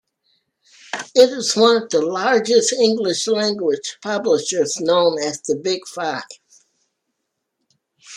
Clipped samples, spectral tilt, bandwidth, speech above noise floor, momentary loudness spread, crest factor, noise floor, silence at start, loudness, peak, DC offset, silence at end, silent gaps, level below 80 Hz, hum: under 0.1%; -2.5 dB/octave; 12.5 kHz; 58 dB; 10 LU; 18 dB; -76 dBFS; 0.95 s; -18 LUFS; -2 dBFS; under 0.1%; 0 s; none; -72 dBFS; none